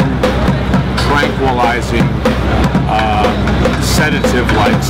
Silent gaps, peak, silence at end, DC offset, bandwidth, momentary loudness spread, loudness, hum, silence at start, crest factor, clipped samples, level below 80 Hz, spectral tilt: none; -6 dBFS; 0 s; under 0.1%; 16.5 kHz; 2 LU; -13 LUFS; none; 0 s; 6 dB; under 0.1%; -20 dBFS; -5.5 dB/octave